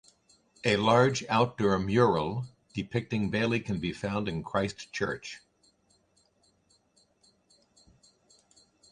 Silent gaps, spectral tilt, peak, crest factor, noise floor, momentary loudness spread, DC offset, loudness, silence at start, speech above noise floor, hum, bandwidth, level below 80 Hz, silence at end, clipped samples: none; -5.5 dB/octave; -8 dBFS; 22 dB; -69 dBFS; 14 LU; under 0.1%; -29 LUFS; 0.65 s; 41 dB; none; 10.5 kHz; -56 dBFS; 3.55 s; under 0.1%